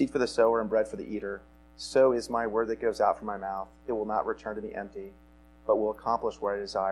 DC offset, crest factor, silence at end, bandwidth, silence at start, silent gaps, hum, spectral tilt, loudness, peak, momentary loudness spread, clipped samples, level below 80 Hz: under 0.1%; 18 dB; 0 s; 12.5 kHz; 0 s; none; none; -5 dB/octave; -29 LUFS; -12 dBFS; 14 LU; under 0.1%; -56 dBFS